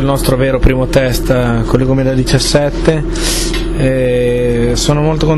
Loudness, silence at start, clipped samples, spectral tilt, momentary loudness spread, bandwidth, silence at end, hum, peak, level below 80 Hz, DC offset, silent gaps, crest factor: -12 LUFS; 0 s; under 0.1%; -5.5 dB/octave; 3 LU; 14 kHz; 0 s; none; 0 dBFS; -18 dBFS; under 0.1%; none; 12 dB